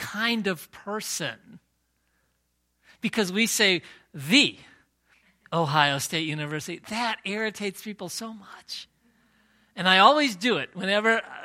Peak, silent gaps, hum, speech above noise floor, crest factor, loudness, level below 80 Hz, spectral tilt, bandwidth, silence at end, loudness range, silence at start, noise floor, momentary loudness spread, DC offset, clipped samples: -2 dBFS; none; none; 48 dB; 24 dB; -24 LUFS; -70 dBFS; -3 dB/octave; 16.5 kHz; 0 s; 8 LU; 0 s; -73 dBFS; 18 LU; under 0.1%; under 0.1%